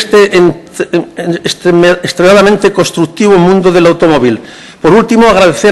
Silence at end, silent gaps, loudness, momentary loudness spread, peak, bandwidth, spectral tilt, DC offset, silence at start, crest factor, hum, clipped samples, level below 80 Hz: 0 s; none; -7 LUFS; 9 LU; 0 dBFS; 12.5 kHz; -5.5 dB/octave; under 0.1%; 0 s; 6 dB; none; 2%; -36 dBFS